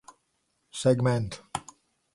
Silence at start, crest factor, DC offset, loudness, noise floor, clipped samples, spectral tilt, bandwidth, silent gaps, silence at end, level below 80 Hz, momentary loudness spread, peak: 0.75 s; 20 dB; under 0.1%; -28 LUFS; -75 dBFS; under 0.1%; -6 dB/octave; 11.5 kHz; none; 0.55 s; -58 dBFS; 14 LU; -10 dBFS